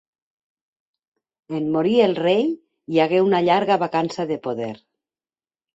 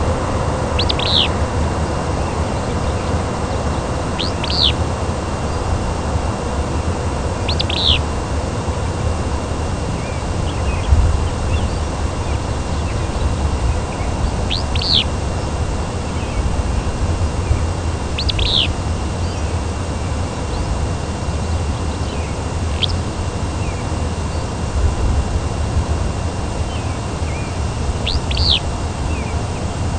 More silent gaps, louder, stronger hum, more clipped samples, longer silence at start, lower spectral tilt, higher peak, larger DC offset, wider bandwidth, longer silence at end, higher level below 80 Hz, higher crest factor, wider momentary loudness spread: neither; about the same, -20 LUFS vs -20 LUFS; neither; neither; first, 1.5 s vs 0 s; first, -6.5 dB/octave vs -5 dB/octave; second, -4 dBFS vs 0 dBFS; neither; second, 8 kHz vs 9.6 kHz; first, 1 s vs 0 s; second, -66 dBFS vs -24 dBFS; about the same, 18 dB vs 18 dB; first, 11 LU vs 8 LU